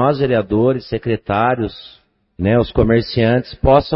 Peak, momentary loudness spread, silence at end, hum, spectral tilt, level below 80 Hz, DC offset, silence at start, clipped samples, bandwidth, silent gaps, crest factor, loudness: 0 dBFS; 7 LU; 0 s; none; -12 dB/octave; -32 dBFS; under 0.1%; 0 s; under 0.1%; 5.8 kHz; none; 16 dB; -16 LUFS